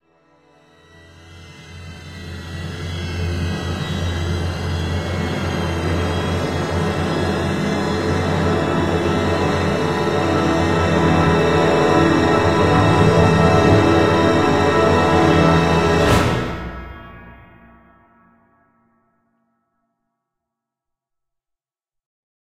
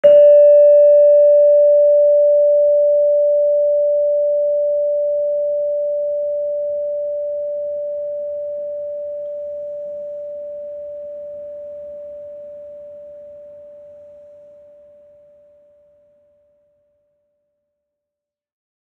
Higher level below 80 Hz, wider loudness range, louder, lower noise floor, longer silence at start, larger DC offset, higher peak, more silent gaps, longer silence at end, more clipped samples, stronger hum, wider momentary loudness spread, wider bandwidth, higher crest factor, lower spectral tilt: first, -36 dBFS vs -68 dBFS; second, 12 LU vs 23 LU; second, -17 LUFS vs -14 LUFS; about the same, -85 dBFS vs -85 dBFS; first, 1.2 s vs 0.05 s; neither; about the same, 0 dBFS vs -2 dBFS; neither; about the same, 5.15 s vs 5.15 s; neither; neither; second, 15 LU vs 23 LU; first, 14.5 kHz vs 3 kHz; about the same, 18 dB vs 16 dB; about the same, -6.5 dB/octave vs -6.5 dB/octave